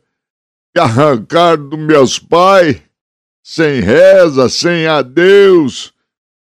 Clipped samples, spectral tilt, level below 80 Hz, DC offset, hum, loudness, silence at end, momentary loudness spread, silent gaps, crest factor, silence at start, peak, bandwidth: 0.8%; -5 dB/octave; -48 dBFS; under 0.1%; none; -9 LUFS; 0.6 s; 10 LU; 3.01-3.43 s; 10 dB; 0.75 s; 0 dBFS; 12.5 kHz